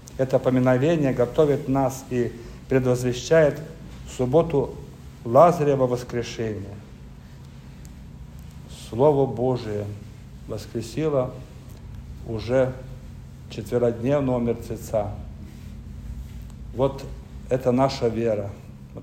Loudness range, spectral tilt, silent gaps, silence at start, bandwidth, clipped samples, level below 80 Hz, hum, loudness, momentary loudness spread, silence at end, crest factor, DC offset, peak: 7 LU; -7 dB/octave; none; 0 s; 16 kHz; under 0.1%; -44 dBFS; none; -23 LUFS; 22 LU; 0 s; 20 dB; under 0.1%; -4 dBFS